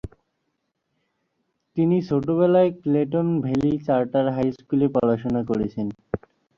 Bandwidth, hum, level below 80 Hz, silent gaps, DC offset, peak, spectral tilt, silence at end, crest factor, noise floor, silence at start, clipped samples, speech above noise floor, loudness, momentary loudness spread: 7.2 kHz; none; -52 dBFS; none; under 0.1%; -6 dBFS; -9.5 dB/octave; 0.4 s; 16 dB; -75 dBFS; 0.05 s; under 0.1%; 54 dB; -22 LUFS; 12 LU